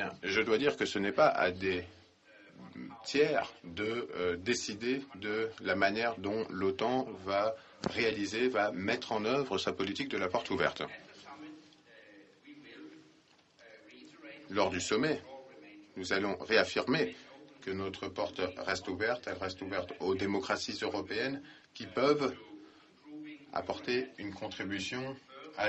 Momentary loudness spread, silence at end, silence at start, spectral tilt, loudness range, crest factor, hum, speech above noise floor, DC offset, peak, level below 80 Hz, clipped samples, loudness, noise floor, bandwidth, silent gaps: 21 LU; 0 s; 0 s; -4 dB/octave; 6 LU; 22 dB; none; 32 dB; under 0.1%; -12 dBFS; -68 dBFS; under 0.1%; -34 LUFS; -65 dBFS; 8.4 kHz; none